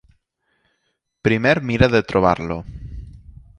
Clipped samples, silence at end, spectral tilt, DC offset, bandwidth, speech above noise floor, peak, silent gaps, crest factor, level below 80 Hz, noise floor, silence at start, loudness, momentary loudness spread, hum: under 0.1%; 0.4 s; -7 dB/octave; under 0.1%; 10.5 kHz; 54 dB; 0 dBFS; none; 20 dB; -38 dBFS; -72 dBFS; 1.25 s; -18 LUFS; 20 LU; none